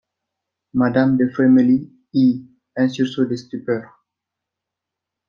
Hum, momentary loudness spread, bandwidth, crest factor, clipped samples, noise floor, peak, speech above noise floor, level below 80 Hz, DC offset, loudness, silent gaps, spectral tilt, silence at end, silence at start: none; 12 LU; 6.8 kHz; 16 dB; under 0.1%; -84 dBFS; -2 dBFS; 67 dB; -60 dBFS; under 0.1%; -19 LUFS; none; -8 dB/octave; 1.45 s; 0.75 s